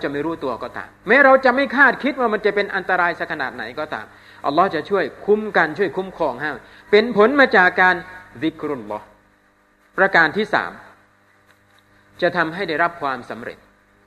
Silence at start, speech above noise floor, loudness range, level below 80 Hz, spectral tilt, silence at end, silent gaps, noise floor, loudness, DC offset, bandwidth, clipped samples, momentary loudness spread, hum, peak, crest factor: 0 s; 39 dB; 5 LU; -58 dBFS; -6 dB/octave; 0.5 s; none; -57 dBFS; -18 LUFS; under 0.1%; 12.5 kHz; under 0.1%; 17 LU; none; 0 dBFS; 20 dB